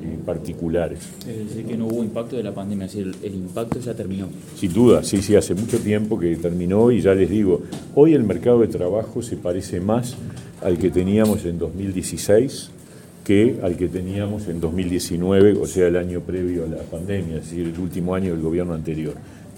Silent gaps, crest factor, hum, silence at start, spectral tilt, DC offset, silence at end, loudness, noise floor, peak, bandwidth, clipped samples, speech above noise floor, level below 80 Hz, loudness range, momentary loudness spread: none; 20 dB; none; 0 s; -6.5 dB/octave; under 0.1%; 0 s; -21 LUFS; -42 dBFS; -2 dBFS; 17 kHz; under 0.1%; 22 dB; -44 dBFS; 8 LU; 13 LU